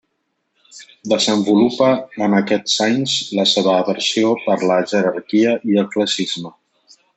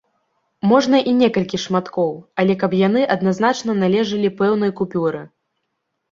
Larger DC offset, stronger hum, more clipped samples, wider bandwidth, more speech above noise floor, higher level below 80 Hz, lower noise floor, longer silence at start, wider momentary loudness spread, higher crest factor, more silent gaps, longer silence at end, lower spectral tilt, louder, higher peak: neither; neither; neither; first, 8.4 kHz vs 7.6 kHz; about the same, 54 dB vs 57 dB; about the same, -64 dBFS vs -60 dBFS; about the same, -71 dBFS vs -74 dBFS; about the same, 0.75 s vs 0.65 s; about the same, 5 LU vs 7 LU; about the same, 14 dB vs 16 dB; neither; second, 0.65 s vs 0.85 s; second, -4 dB/octave vs -6 dB/octave; about the same, -17 LUFS vs -18 LUFS; about the same, -2 dBFS vs -2 dBFS